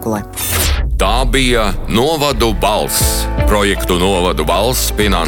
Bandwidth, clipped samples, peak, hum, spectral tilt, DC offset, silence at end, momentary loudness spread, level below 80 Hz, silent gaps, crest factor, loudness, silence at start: 17.5 kHz; under 0.1%; -2 dBFS; none; -4 dB/octave; under 0.1%; 0 s; 3 LU; -18 dBFS; none; 12 dB; -14 LUFS; 0 s